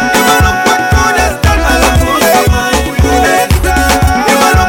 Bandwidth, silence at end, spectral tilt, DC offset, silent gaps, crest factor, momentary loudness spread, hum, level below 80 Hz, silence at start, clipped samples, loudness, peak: 17 kHz; 0 s; -4 dB/octave; under 0.1%; none; 8 dB; 3 LU; none; -16 dBFS; 0 s; under 0.1%; -9 LUFS; 0 dBFS